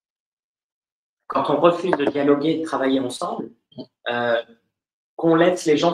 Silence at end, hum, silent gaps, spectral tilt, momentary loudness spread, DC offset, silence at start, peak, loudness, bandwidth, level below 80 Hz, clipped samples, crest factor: 0 s; none; 4.93-5.17 s; -5.5 dB/octave; 15 LU; under 0.1%; 1.3 s; -2 dBFS; -21 LUFS; 12.5 kHz; -68 dBFS; under 0.1%; 20 dB